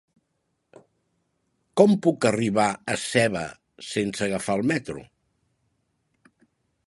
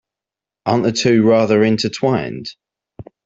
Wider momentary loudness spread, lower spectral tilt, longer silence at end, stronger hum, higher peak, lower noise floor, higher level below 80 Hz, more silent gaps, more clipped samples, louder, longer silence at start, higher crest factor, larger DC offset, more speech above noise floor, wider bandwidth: about the same, 15 LU vs 14 LU; about the same, -5 dB/octave vs -5.5 dB/octave; first, 1.85 s vs 0.25 s; neither; about the same, -2 dBFS vs -2 dBFS; second, -75 dBFS vs -87 dBFS; second, -60 dBFS vs -54 dBFS; neither; neither; second, -23 LUFS vs -16 LUFS; first, 1.75 s vs 0.65 s; first, 24 dB vs 16 dB; neither; second, 52 dB vs 72 dB; first, 11.5 kHz vs 7.8 kHz